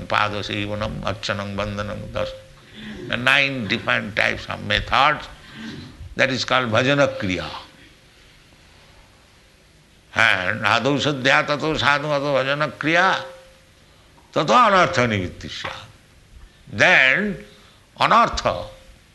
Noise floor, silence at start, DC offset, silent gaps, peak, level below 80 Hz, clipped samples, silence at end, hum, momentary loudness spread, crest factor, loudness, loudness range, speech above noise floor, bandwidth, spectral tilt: -52 dBFS; 0 s; under 0.1%; none; -2 dBFS; -46 dBFS; under 0.1%; 0.4 s; none; 19 LU; 20 dB; -19 LUFS; 5 LU; 32 dB; 12 kHz; -4.5 dB/octave